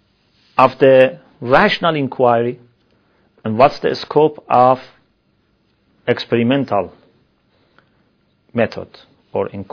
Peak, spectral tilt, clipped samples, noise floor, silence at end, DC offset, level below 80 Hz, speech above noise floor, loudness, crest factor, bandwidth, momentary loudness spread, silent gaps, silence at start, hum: 0 dBFS; -7.5 dB/octave; under 0.1%; -61 dBFS; 0.1 s; under 0.1%; -52 dBFS; 46 dB; -15 LUFS; 18 dB; 5.4 kHz; 16 LU; none; 0.6 s; none